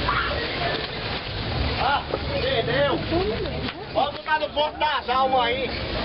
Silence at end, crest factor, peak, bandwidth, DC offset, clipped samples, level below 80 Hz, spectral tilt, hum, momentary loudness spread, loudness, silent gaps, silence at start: 0 s; 14 dB; -10 dBFS; 5.8 kHz; under 0.1%; under 0.1%; -38 dBFS; -8.5 dB/octave; none; 6 LU; -24 LUFS; none; 0 s